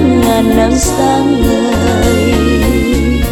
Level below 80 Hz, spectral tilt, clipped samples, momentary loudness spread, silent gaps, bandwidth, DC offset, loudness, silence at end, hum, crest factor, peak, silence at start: -18 dBFS; -5.5 dB/octave; under 0.1%; 2 LU; none; over 20 kHz; under 0.1%; -11 LUFS; 0 s; none; 10 dB; 0 dBFS; 0 s